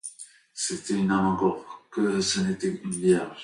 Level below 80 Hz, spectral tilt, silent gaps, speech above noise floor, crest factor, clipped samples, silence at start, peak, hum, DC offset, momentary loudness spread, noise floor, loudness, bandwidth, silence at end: -58 dBFS; -4.5 dB/octave; none; 23 dB; 18 dB; under 0.1%; 0.05 s; -10 dBFS; none; under 0.1%; 15 LU; -48 dBFS; -26 LUFS; 11.5 kHz; 0 s